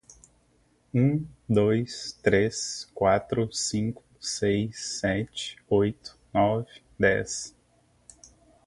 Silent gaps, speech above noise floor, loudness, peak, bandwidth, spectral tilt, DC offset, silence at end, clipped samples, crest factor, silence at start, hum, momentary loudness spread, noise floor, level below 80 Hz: none; 39 dB; -27 LUFS; -6 dBFS; 11.5 kHz; -5 dB/octave; under 0.1%; 1.15 s; under 0.1%; 22 dB; 0.95 s; 60 Hz at -55 dBFS; 10 LU; -65 dBFS; -54 dBFS